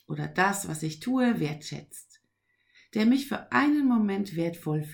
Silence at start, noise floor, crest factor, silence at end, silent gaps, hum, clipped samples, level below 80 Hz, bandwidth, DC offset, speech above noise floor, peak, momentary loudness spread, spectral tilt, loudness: 0.1 s; -74 dBFS; 18 dB; 0 s; none; none; under 0.1%; -70 dBFS; over 20 kHz; under 0.1%; 47 dB; -10 dBFS; 14 LU; -5.5 dB/octave; -27 LUFS